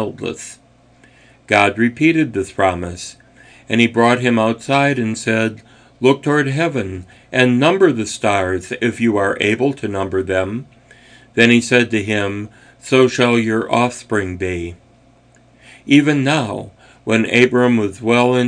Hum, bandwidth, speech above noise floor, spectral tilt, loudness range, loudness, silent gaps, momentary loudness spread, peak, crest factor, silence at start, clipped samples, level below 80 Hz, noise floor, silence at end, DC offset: none; 10 kHz; 34 dB; -5.5 dB/octave; 3 LU; -16 LUFS; none; 14 LU; 0 dBFS; 16 dB; 0 s; under 0.1%; -52 dBFS; -50 dBFS; 0 s; under 0.1%